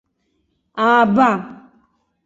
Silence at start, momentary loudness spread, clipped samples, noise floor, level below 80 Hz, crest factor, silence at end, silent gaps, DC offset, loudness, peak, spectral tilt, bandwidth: 0.75 s; 20 LU; under 0.1%; -68 dBFS; -62 dBFS; 18 dB; 0.7 s; none; under 0.1%; -15 LUFS; -2 dBFS; -6.5 dB/octave; 7.8 kHz